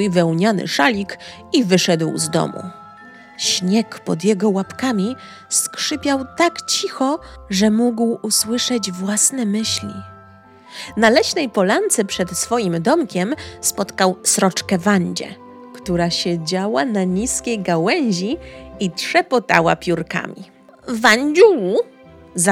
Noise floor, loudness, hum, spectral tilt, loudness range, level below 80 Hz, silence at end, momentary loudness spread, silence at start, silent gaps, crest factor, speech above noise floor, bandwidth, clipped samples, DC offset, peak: -44 dBFS; -18 LUFS; none; -3.5 dB/octave; 3 LU; -50 dBFS; 0 s; 13 LU; 0 s; none; 18 dB; 26 dB; 17 kHz; under 0.1%; under 0.1%; 0 dBFS